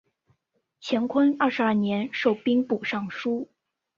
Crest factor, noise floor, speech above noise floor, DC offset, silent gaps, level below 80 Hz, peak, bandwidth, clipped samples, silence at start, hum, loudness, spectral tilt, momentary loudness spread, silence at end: 18 dB; -74 dBFS; 49 dB; under 0.1%; none; -70 dBFS; -8 dBFS; 7.4 kHz; under 0.1%; 0.8 s; none; -25 LUFS; -6.5 dB/octave; 8 LU; 0.55 s